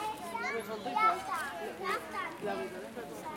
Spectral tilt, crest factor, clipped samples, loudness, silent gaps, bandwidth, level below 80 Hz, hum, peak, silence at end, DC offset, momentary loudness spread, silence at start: -3.5 dB/octave; 20 dB; under 0.1%; -35 LUFS; none; 16.5 kHz; -70 dBFS; none; -16 dBFS; 0 s; under 0.1%; 12 LU; 0 s